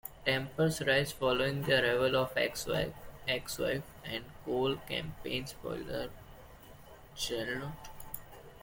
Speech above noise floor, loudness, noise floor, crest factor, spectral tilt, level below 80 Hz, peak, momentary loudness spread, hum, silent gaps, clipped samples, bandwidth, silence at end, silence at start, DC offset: 20 dB; -33 LUFS; -53 dBFS; 20 dB; -4 dB/octave; -56 dBFS; -14 dBFS; 17 LU; none; none; under 0.1%; 17 kHz; 0 s; 0.05 s; under 0.1%